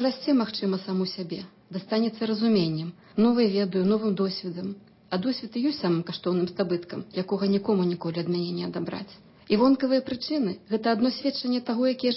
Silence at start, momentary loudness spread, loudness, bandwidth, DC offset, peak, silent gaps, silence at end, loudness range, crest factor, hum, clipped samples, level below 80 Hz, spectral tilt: 0 s; 11 LU; -26 LUFS; 5.8 kHz; under 0.1%; -10 dBFS; none; 0 s; 3 LU; 14 dB; none; under 0.1%; -66 dBFS; -10 dB/octave